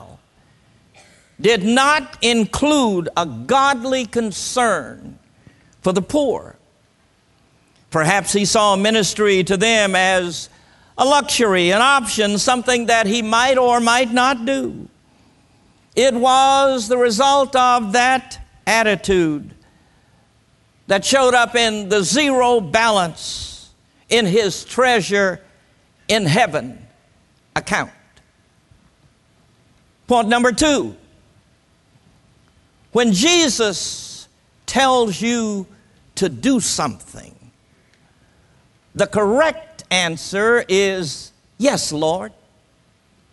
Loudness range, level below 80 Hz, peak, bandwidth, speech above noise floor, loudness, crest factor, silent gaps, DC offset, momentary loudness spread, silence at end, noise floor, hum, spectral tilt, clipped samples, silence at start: 7 LU; -50 dBFS; 0 dBFS; 12 kHz; 41 dB; -16 LUFS; 18 dB; none; under 0.1%; 13 LU; 1.05 s; -58 dBFS; none; -3 dB/octave; under 0.1%; 0 s